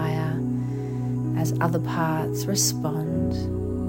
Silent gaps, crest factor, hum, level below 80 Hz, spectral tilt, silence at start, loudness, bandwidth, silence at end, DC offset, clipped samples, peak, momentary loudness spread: none; 16 dB; none; -46 dBFS; -5 dB/octave; 0 s; -25 LUFS; 17 kHz; 0 s; under 0.1%; under 0.1%; -10 dBFS; 6 LU